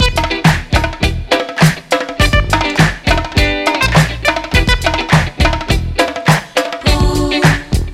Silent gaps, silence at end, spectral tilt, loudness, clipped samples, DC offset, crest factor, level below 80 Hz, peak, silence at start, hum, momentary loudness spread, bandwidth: none; 0 s; -5 dB/octave; -13 LUFS; 0.1%; under 0.1%; 12 dB; -20 dBFS; 0 dBFS; 0 s; none; 5 LU; 16 kHz